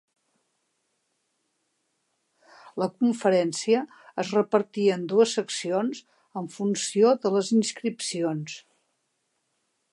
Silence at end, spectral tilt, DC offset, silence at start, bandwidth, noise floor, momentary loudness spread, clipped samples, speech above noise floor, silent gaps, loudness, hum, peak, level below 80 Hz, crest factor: 1.35 s; -4.5 dB/octave; under 0.1%; 2.65 s; 11.5 kHz; -76 dBFS; 14 LU; under 0.1%; 51 dB; none; -25 LUFS; none; -8 dBFS; -80 dBFS; 18 dB